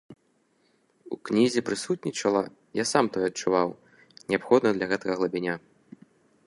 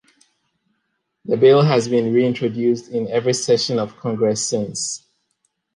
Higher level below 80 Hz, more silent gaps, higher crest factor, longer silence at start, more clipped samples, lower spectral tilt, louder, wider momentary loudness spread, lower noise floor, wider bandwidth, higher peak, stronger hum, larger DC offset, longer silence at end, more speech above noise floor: second, -68 dBFS vs -62 dBFS; neither; first, 22 dB vs 16 dB; second, 0.1 s vs 1.25 s; neither; about the same, -4.5 dB/octave vs -5 dB/octave; second, -26 LUFS vs -18 LUFS; about the same, 10 LU vs 11 LU; second, -68 dBFS vs -73 dBFS; about the same, 11.5 kHz vs 11.5 kHz; about the same, -6 dBFS vs -4 dBFS; neither; neither; about the same, 0.9 s vs 0.8 s; second, 43 dB vs 55 dB